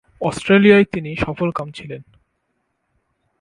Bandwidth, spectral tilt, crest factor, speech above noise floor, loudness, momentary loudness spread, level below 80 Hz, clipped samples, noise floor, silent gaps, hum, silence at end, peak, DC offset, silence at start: 11 kHz; -6.5 dB/octave; 18 dB; 54 dB; -16 LUFS; 22 LU; -46 dBFS; under 0.1%; -71 dBFS; none; none; 1.4 s; 0 dBFS; under 0.1%; 0.2 s